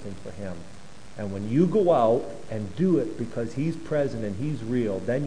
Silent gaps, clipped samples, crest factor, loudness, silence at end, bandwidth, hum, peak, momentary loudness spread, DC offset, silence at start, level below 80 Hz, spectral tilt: none; under 0.1%; 16 dB; -26 LUFS; 0 s; 10.5 kHz; none; -8 dBFS; 17 LU; 1%; 0 s; -54 dBFS; -8 dB/octave